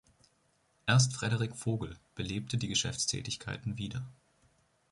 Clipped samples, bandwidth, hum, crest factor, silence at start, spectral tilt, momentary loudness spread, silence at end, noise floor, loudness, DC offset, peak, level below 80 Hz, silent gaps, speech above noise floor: under 0.1%; 11.5 kHz; none; 22 dB; 0.85 s; -4 dB/octave; 14 LU; 0.8 s; -72 dBFS; -33 LUFS; under 0.1%; -14 dBFS; -58 dBFS; none; 39 dB